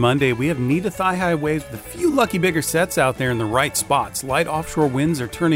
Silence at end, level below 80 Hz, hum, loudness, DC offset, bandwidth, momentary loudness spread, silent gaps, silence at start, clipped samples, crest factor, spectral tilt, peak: 0 s; -44 dBFS; none; -20 LUFS; under 0.1%; 16 kHz; 4 LU; none; 0 s; under 0.1%; 16 dB; -5 dB/octave; -4 dBFS